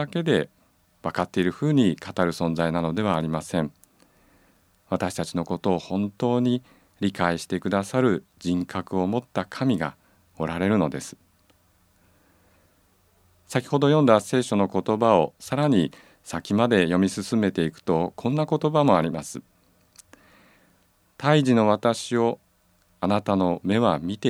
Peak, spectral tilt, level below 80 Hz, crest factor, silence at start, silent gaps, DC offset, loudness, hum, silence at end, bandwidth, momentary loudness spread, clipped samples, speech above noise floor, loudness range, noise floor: -2 dBFS; -6.5 dB/octave; -58 dBFS; 22 dB; 0 s; none; under 0.1%; -24 LUFS; none; 0 s; 14.5 kHz; 10 LU; under 0.1%; 40 dB; 6 LU; -63 dBFS